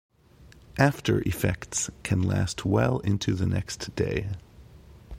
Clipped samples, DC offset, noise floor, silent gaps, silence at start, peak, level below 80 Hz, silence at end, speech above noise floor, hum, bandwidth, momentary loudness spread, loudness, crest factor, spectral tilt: under 0.1%; under 0.1%; -53 dBFS; none; 0.4 s; -4 dBFS; -46 dBFS; 0 s; 27 dB; none; 15.5 kHz; 8 LU; -27 LUFS; 24 dB; -5.5 dB/octave